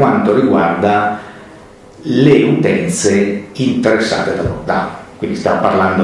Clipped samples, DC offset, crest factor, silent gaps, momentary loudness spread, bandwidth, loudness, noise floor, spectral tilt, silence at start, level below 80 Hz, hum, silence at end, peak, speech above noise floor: under 0.1%; under 0.1%; 14 dB; none; 11 LU; 12 kHz; -13 LUFS; -38 dBFS; -5.5 dB/octave; 0 s; -44 dBFS; none; 0 s; 0 dBFS; 25 dB